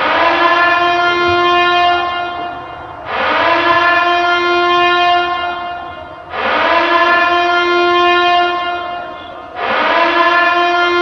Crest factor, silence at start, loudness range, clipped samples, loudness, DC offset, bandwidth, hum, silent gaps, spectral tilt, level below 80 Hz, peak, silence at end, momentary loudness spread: 12 dB; 0 s; 1 LU; under 0.1%; -12 LUFS; under 0.1%; 6.8 kHz; none; none; -4 dB/octave; -48 dBFS; 0 dBFS; 0 s; 14 LU